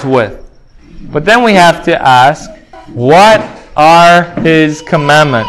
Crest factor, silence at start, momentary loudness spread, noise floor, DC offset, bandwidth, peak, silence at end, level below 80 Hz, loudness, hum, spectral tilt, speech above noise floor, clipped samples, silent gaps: 8 dB; 0 s; 13 LU; -36 dBFS; under 0.1%; 16 kHz; 0 dBFS; 0 s; -38 dBFS; -7 LUFS; none; -5 dB/octave; 29 dB; 4%; none